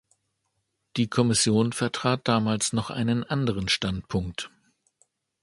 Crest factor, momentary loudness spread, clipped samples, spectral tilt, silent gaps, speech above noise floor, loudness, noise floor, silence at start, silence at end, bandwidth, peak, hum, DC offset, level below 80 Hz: 20 dB; 10 LU; under 0.1%; -4.5 dB/octave; none; 52 dB; -25 LUFS; -77 dBFS; 0.95 s; 0.95 s; 11.5 kHz; -6 dBFS; none; under 0.1%; -50 dBFS